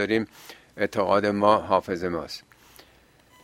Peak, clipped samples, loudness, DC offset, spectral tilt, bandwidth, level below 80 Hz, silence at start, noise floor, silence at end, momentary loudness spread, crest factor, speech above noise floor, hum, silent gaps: -4 dBFS; under 0.1%; -24 LUFS; under 0.1%; -6 dB/octave; 16.5 kHz; -58 dBFS; 0 s; -57 dBFS; 1.05 s; 18 LU; 22 dB; 33 dB; none; none